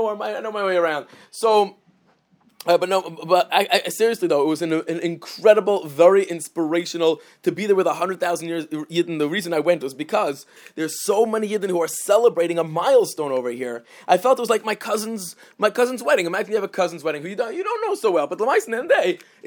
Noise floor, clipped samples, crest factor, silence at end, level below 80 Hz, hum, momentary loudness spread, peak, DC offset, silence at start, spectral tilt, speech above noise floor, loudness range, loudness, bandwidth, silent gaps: -60 dBFS; under 0.1%; 20 dB; 0 s; -80 dBFS; none; 10 LU; 0 dBFS; under 0.1%; 0 s; -4 dB/octave; 40 dB; 3 LU; -21 LUFS; over 20 kHz; none